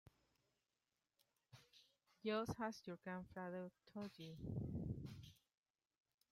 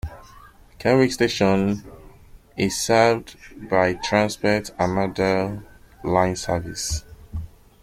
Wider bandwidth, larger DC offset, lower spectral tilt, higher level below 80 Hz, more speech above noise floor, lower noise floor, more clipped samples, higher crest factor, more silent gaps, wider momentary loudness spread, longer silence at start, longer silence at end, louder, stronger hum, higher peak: about the same, 16 kHz vs 16 kHz; neither; first, -6.5 dB/octave vs -5 dB/octave; second, -70 dBFS vs -44 dBFS; first, over 42 dB vs 26 dB; first, under -90 dBFS vs -47 dBFS; neither; about the same, 20 dB vs 20 dB; neither; first, 22 LU vs 18 LU; first, 1.55 s vs 0.05 s; first, 1 s vs 0.35 s; second, -50 LUFS vs -22 LUFS; neither; second, -32 dBFS vs -2 dBFS